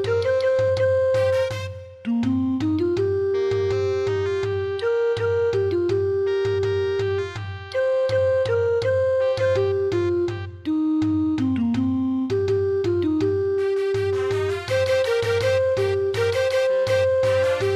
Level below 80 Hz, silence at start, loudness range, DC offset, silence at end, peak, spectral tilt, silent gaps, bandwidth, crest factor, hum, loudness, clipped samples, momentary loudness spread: -54 dBFS; 0 s; 1 LU; under 0.1%; 0 s; -10 dBFS; -6.5 dB/octave; none; 13 kHz; 12 dB; none; -22 LUFS; under 0.1%; 4 LU